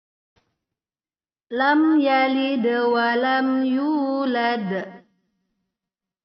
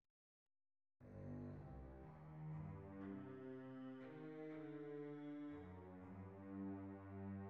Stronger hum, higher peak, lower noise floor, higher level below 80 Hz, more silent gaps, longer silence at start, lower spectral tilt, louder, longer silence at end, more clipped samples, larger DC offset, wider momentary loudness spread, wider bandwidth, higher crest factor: neither; first, -6 dBFS vs -42 dBFS; about the same, under -90 dBFS vs under -90 dBFS; about the same, -74 dBFS vs -72 dBFS; neither; first, 1.5 s vs 1 s; second, -2.5 dB/octave vs -8.5 dB/octave; first, -21 LUFS vs -55 LUFS; first, 1.25 s vs 0 s; neither; neither; first, 9 LU vs 6 LU; about the same, 6 kHz vs 6 kHz; about the same, 16 dB vs 14 dB